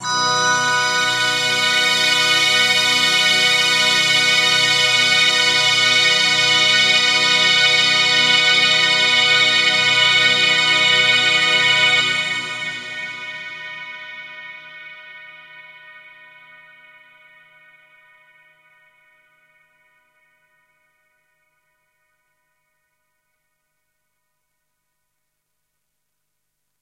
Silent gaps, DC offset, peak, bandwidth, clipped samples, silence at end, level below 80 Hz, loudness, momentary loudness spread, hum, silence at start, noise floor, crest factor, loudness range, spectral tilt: none; under 0.1%; -2 dBFS; 16 kHz; under 0.1%; 10.85 s; -70 dBFS; -13 LUFS; 16 LU; 50 Hz at -80 dBFS; 0 s; -76 dBFS; 16 dB; 17 LU; 0 dB/octave